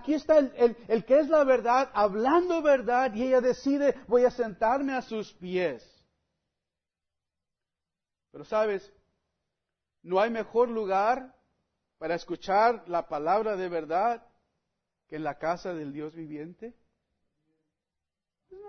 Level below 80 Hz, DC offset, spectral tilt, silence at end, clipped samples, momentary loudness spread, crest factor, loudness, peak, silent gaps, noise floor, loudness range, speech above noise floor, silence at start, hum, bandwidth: -62 dBFS; under 0.1%; -6 dB/octave; 0 s; under 0.1%; 15 LU; 18 dB; -27 LUFS; -10 dBFS; none; -88 dBFS; 14 LU; 62 dB; 0 s; none; 6.6 kHz